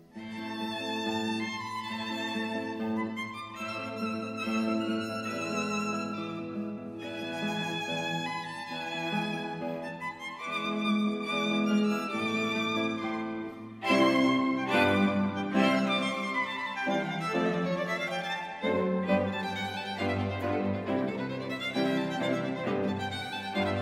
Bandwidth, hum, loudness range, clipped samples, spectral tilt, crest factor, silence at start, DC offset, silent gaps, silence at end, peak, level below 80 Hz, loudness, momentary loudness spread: 15 kHz; none; 6 LU; under 0.1%; -5.5 dB/octave; 20 dB; 0 s; under 0.1%; none; 0 s; -10 dBFS; -70 dBFS; -31 LUFS; 10 LU